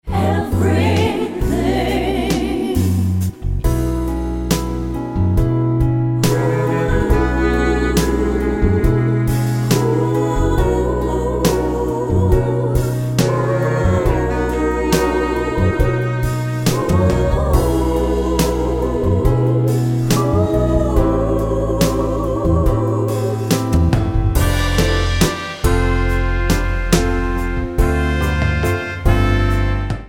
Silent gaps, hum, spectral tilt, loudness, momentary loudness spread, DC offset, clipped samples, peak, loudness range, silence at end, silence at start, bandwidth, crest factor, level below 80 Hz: none; none; -6.5 dB/octave; -17 LUFS; 4 LU; under 0.1%; under 0.1%; 0 dBFS; 2 LU; 0 s; 0.05 s; 17 kHz; 16 dB; -22 dBFS